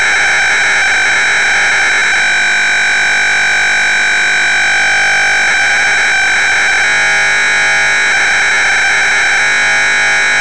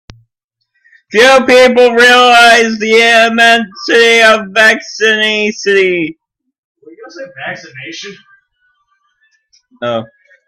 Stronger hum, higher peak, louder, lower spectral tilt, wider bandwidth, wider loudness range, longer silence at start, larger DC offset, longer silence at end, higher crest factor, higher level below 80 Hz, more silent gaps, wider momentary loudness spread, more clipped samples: neither; second, -6 dBFS vs 0 dBFS; about the same, -8 LUFS vs -7 LUFS; second, 0.5 dB/octave vs -2.5 dB/octave; second, 11 kHz vs 15.5 kHz; second, 0 LU vs 22 LU; second, 0 s vs 1.1 s; first, 4% vs under 0.1%; second, 0 s vs 0.4 s; second, 4 dB vs 10 dB; first, -42 dBFS vs -52 dBFS; second, none vs 6.58-6.75 s; second, 0 LU vs 20 LU; second, under 0.1% vs 0.3%